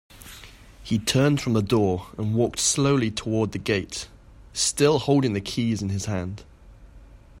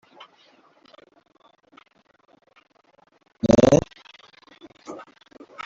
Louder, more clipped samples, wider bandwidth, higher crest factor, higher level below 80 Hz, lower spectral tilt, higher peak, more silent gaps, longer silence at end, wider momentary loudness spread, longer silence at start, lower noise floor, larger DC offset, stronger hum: second, -23 LUFS vs -18 LUFS; neither; first, 16 kHz vs 7.8 kHz; second, 18 dB vs 24 dB; about the same, -48 dBFS vs -50 dBFS; second, -4.5 dB/octave vs -6.5 dB/octave; second, -8 dBFS vs -2 dBFS; neither; second, 0 s vs 0.7 s; second, 20 LU vs 28 LU; second, 0.15 s vs 3.45 s; second, -47 dBFS vs -60 dBFS; neither; neither